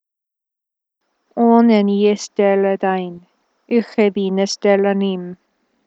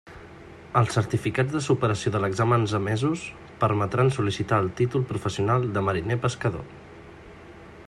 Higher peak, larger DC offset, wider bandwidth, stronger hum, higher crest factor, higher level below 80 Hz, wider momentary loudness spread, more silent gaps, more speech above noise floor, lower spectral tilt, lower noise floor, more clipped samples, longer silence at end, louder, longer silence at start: first, 0 dBFS vs -6 dBFS; neither; second, 8 kHz vs 11.5 kHz; neither; about the same, 18 dB vs 18 dB; second, -72 dBFS vs -54 dBFS; second, 12 LU vs 23 LU; neither; first, 69 dB vs 21 dB; about the same, -6 dB/octave vs -6.5 dB/octave; first, -84 dBFS vs -45 dBFS; neither; first, 0.55 s vs 0.05 s; first, -16 LUFS vs -25 LUFS; first, 1.35 s vs 0.05 s